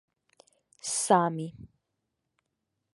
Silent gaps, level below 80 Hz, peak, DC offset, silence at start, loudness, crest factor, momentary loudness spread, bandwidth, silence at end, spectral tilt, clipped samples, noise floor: none; -70 dBFS; -8 dBFS; under 0.1%; 0.85 s; -27 LUFS; 24 dB; 15 LU; 11.5 kHz; 1.25 s; -4 dB/octave; under 0.1%; -82 dBFS